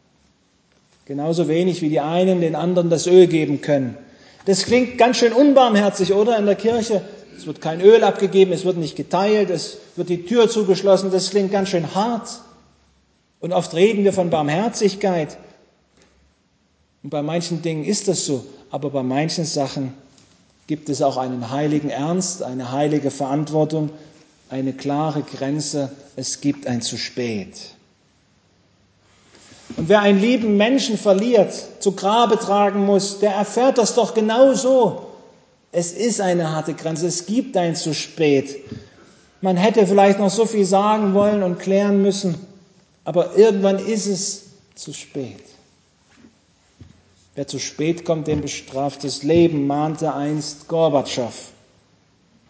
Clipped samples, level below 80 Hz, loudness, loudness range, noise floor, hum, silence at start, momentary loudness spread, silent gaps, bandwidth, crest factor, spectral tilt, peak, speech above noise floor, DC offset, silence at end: under 0.1%; -58 dBFS; -19 LUFS; 9 LU; -62 dBFS; none; 1.1 s; 14 LU; none; 8 kHz; 20 dB; -5 dB/octave; 0 dBFS; 44 dB; under 0.1%; 1 s